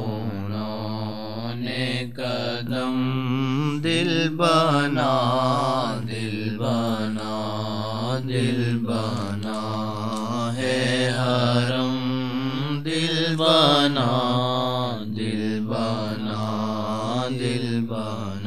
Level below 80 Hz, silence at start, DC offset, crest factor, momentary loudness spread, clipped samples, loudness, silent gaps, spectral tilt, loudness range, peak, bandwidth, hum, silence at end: -62 dBFS; 0 s; 1%; 20 dB; 9 LU; under 0.1%; -24 LUFS; none; -6 dB/octave; 5 LU; -4 dBFS; 13.5 kHz; none; 0 s